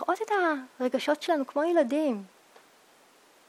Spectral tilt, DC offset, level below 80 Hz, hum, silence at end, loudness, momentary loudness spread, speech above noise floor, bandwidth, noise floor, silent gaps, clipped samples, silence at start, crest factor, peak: -4 dB/octave; under 0.1%; -86 dBFS; none; 1.2 s; -28 LUFS; 6 LU; 32 dB; 15 kHz; -59 dBFS; none; under 0.1%; 0 s; 16 dB; -12 dBFS